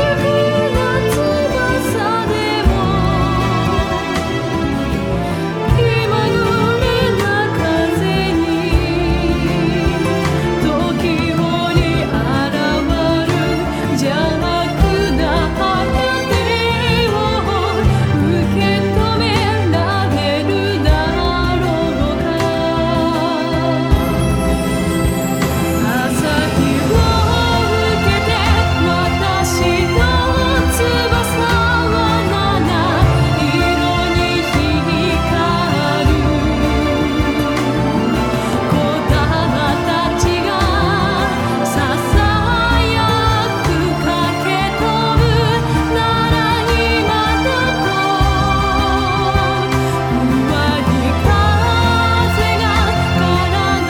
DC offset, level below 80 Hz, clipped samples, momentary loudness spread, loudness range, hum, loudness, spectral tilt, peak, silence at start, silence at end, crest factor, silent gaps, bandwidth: under 0.1%; -24 dBFS; under 0.1%; 3 LU; 2 LU; none; -15 LUFS; -5.5 dB/octave; 0 dBFS; 0 s; 0 s; 14 dB; none; 19.5 kHz